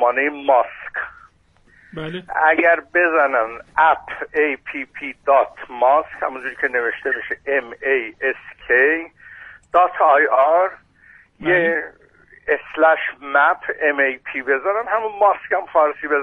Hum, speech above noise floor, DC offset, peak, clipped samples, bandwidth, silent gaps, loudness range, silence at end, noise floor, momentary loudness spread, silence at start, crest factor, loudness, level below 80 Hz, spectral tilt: none; 37 dB; under 0.1%; -2 dBFS; under 0.1%; 4 kHz; none; 3 LU; 0 s; -55 dBFS; 13 LU; 0 s; 18 dB; -18 LUFS; -58 dBFS; -6.5 dB/octave